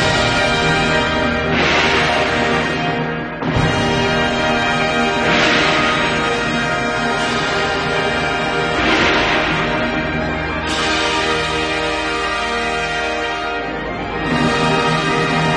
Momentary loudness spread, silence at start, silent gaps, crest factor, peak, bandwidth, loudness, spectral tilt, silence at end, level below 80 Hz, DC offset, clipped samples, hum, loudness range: 6 LU; 0 s; none; 14 dB; -2 dBFS; 10.5 kHz; -16 LUFS; -4 dB/octave; 0 s; -34 dBFS; under 0.1%; under 0.1%; none; 3 LU